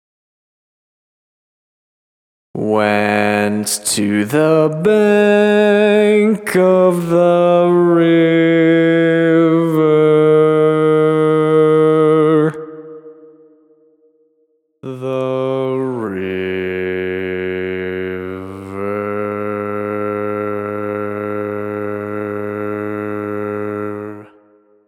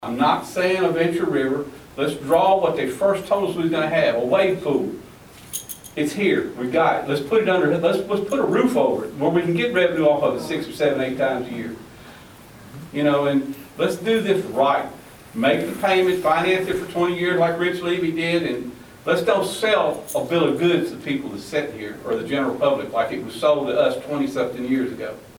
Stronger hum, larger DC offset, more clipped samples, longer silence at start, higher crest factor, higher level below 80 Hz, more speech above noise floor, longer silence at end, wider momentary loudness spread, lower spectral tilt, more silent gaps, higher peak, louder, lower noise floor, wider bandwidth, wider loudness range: neither; neither; neither; first, 2.55 s vs 0 s; about the same, 14 dB vs 18 dB; second, -64 dBFS vs -56 dBFS; first, 50 dB vs 23 dB; first, 0.65 s vs 0.05 s; about the same, 11 LU vs 9 LU; about the same, -6 dB/octave vs -5.5 dB/octave; neither; about the same, -2 dBFS vs -4 dBFS; first, -15 LUFS vs -21 LUFS; first, -62 dBFS vs -43 dBFS; second, 16.5 kHz vs over 20 kHz; first, 10 LU vs 3 LU